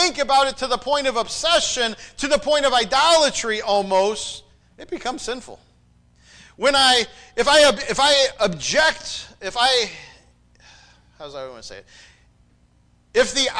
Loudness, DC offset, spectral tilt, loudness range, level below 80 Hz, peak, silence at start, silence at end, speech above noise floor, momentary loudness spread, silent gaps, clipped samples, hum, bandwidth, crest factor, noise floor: -18 LUFS; under 0.1%; -1.5 dB/octave; 9 LU; -48 dBFS; -6 dBFS; 0 s; 0 s; 38 dB; 18 LU; none; under 0.1%; 60 Hz at -60 dBFS; 10.5 kHz; 16 dB; -58 dBFS